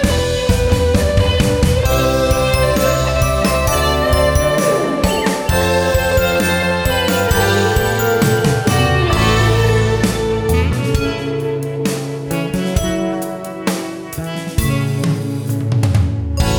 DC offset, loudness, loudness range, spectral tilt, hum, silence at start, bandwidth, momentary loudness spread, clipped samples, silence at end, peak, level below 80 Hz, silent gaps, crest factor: under 0.1%; -16 LUFS; 6 LU; -5 dB/octave; none; 0 s; over 20 kHz; 7 LU; under 0.1%; 0 s; -2 dBFS; -24 dBFS; none; 14 dB